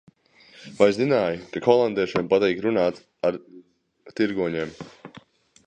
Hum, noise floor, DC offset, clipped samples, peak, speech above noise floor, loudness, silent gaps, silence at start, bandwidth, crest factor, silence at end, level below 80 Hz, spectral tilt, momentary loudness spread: none; -54 dBFS; under 0.1%; under 0.1%; -2 dBFS; 32 dB; -23 LUFS; none; 0.6 s; 9.2 kHz; 22 dB; 0.6 s; -60 dBFS; -6.5 dB/octave; 18 LU